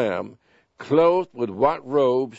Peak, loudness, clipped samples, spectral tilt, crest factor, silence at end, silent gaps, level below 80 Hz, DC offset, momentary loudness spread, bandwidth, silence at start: -4 dBFS; -21 LUFS; under 0.1%; -7.5 dB/octave; 18 dB; 0 s; none; -62 dBFS; under 0.1%; 15 LU; 7.8 kHz; 0 s